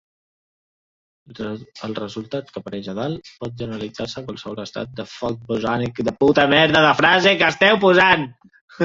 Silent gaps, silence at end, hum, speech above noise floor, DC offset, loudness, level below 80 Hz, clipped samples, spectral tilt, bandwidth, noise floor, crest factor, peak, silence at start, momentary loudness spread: 8.61-8.68 s; 0 s; none; over 71 dB; under 0.1%; -17 LUFS; -54 dBFS; under 0.1%; -5 dB/octave; 7.8 kHz; under -90 dBFS; 20 dB; 0 dBFS; 1.3 s; 18 LU